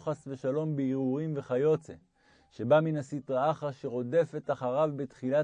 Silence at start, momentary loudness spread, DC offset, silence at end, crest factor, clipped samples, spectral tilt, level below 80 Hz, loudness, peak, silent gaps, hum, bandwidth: 0 s; 9 LU; under 0.1%; 0 s; 18 dB; under 0.1%; -8 dB/octave; -74 dBFS; -31 LUFS; -12 dBFS; none; none; 9.8 kHz